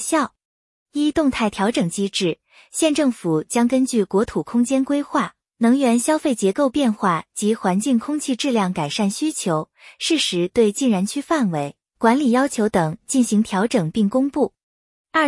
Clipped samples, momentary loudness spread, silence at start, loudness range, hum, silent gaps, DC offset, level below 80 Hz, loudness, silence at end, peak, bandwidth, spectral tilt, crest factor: under 0.1%; 6 LU; 0 s; 2 LU; none; 0.45-0.86 s, 14.63-15.04 s; under 0.1%; -56 dBFS; -20 LUFS; 0 s; -2 dBFS; 12 kHz; -4.5 dB/octave; 16 dB